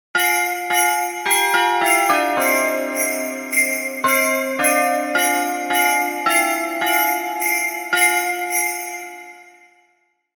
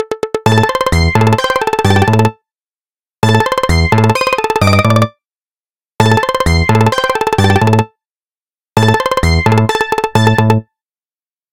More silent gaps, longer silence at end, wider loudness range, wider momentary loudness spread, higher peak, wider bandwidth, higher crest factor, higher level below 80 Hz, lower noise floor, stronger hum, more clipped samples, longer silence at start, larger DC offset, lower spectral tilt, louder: second, none vs 2.67-2.81 s, 2.90-3.04 s, 5.25-5.29 s, 5.35-5.63 s, 5.69-5.93 s, 8.05-8.16 s, 8.25-8.65 s; about the same, 0.9 s vs 0.9 s; about the same, 2 LU vs 1 LU; about the same, 5 LU vs 4 LU; about the same, -2 dBFS vs 0 dBFS; first, 19 kHz vs 16.5 kHz; about the same, 16 dB vs 12 dB; second, -66 dBFS vs -30 dBFS; second, -64 dBFS vs under -90 dBFS; neither; second, under 0.1% vs 0.2%; first, 0.15 s vs 0 s; second, under 0.1% vs 1%; second, 0 dB/octave vs -6 dB/octave; second, -17 LUFS vs -12 LUFS